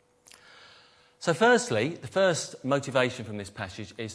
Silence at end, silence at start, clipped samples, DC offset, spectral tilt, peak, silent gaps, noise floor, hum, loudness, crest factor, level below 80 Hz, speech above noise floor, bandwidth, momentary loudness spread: 0 s; 1.2 s; under 0.1%; under 0.1%; -4 dB/octave; -8 dBFS; none; -58 dBFS; none; -27 LUFS; 20 dB; -68 dBFS; 31 dB; 11 kHz; 16 LU